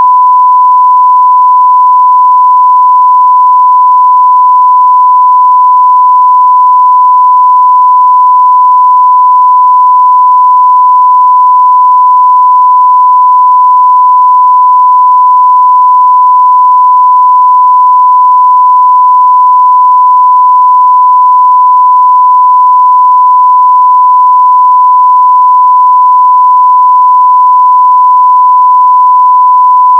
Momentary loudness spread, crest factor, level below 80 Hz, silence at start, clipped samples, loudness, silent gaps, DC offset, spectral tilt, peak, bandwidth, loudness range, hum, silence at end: 0 LU; 4 dB; under -90 dBFS; 0 s; 4%; -3 LUFS; none; under 0.1%; 2 dB/octave; 0 dBFS; 1.2 kHz; 0 LU; none; 0 s